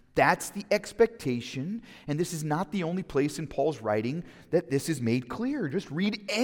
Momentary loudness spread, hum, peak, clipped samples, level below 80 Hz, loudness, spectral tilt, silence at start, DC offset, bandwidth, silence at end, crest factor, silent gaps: 9 LU; none; -8 dBFS; under 0.1%; -58 dBFS; -29 LUFS; -5.5 dB/octave; 0.15 s; under 0.1%; 18 kHz; 0 s; 20 dB; none